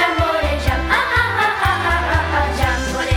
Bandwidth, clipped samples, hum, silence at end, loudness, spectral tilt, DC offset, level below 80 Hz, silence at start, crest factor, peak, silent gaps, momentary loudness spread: 16.5 kHz; under 0.1%; none; 0 s; -17 LUFS; -4.5 dB/octave; under 0.1%; -26 dBFS; 0 s; 16 dB; -2 dBFS; none; 3 LU